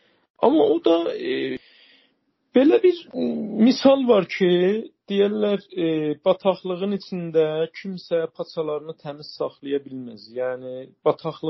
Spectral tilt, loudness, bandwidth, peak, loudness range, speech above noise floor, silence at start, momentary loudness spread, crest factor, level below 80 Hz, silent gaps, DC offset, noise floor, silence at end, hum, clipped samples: -5 dB/octave; -22 LUFS; 6 kHz; -2 dBFS; 9 LU; 46 dB; 0.4 s; 13 LU; 20 dB; -72 dBFS; none; under 0.1%; -67 dBFS; 0 s; none; under 0.1%